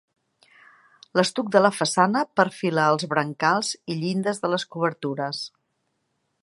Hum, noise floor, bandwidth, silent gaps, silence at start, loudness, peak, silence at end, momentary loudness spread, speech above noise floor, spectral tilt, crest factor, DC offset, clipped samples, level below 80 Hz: none; -74 dBFS; 11.5 kHz; none; 1.15 s; -23 LUFS; -2 dBFS; 0.95 s; 9 LU; 51 dB; -4.5 dB/octave; 22 dB; under 0.1%; under 0.1%; -74 dBFS